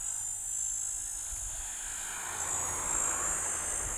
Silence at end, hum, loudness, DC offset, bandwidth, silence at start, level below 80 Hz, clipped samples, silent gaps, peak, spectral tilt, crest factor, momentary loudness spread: 0 s; none; -32 LUFS; under 0.1%; over 20 kHz; 0 s; -52 dBFS; under 0.1%; none; -20 dBFS; -0.5 dB/octave; 16 dB; 7 LU